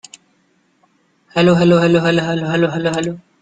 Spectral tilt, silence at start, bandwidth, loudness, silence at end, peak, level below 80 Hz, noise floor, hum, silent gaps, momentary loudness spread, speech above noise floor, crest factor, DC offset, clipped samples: -6.5 dB/octave; 1.35 s; 9.2 kHz; -15 LUFS; 0.2 s; -2 dBFS; -52 dBFS; -60 dBFS; none; none; 10 LU; 45 dB; 16 dB; under 0.1%; under 0.1%